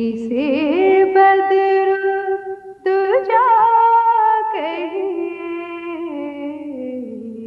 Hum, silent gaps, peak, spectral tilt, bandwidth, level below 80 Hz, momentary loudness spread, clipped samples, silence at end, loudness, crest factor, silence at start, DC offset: none; none; -4 dBFS; -6.5 dB/octave; 5.4 kHz; -64 dBFS; 15 LU; under 0.1%; 0 s; -16 LUFS; 12 dB; 0 s; under 0.1%